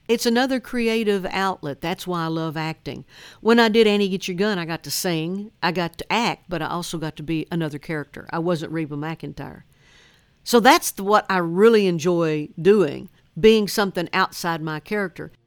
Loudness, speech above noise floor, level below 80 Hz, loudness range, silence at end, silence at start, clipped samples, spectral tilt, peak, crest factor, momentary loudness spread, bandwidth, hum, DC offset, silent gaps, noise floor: -21 LUFS; 34 dB; -52 dBFS; 8 LU; 0.2 s; 0.1 s; under 0.1%; -4.5 dB/octave; 0 dBFS; 22 dB; 14 LU; 19 kHz; none; under 0.1%; none; -55 dBFS